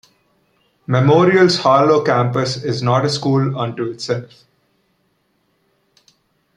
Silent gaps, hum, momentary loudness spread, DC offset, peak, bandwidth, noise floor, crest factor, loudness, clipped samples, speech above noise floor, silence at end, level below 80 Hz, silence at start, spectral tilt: none; none; 12 LU; under 0.1%; 0 dBFS; 10.5 kHz; -64 dBFS; 18 dB; -16 LUFS; under 0.1%; 49 dB; 2.3 s; -58 dBFS; 0.9 s; -6 dB/octave